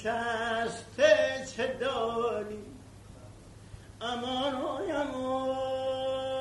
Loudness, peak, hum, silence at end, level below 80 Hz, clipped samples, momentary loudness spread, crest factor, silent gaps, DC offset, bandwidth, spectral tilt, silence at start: -31 LUFS; -10 dBFS; none; 0 s; -58 dBFS; under 0.1%; 25 LU; 22 dB; none; under 0.1%; 11.5 kHz; -4 dB/octave; 0 s